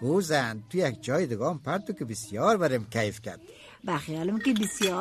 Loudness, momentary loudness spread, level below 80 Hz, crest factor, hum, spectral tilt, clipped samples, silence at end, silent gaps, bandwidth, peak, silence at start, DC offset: -28 LUFS; 10 LU; -64 dBFS; 18 dB; none; -5 dB/octave; under 0.1%; 0 s; none; 13.5 kHz; -10 dBFS; 0 s; under 0.1%